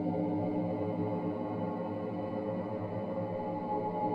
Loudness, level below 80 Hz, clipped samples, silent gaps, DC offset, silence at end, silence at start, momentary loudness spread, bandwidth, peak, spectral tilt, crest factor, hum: -35 LUFS; -68 dBFS; under 0.1%; none; under 0.1%; 0 s; 0 s; 4 LU; 5.2 kHz; -20 dBFS; -10.5 dB/octave; 14 dB; none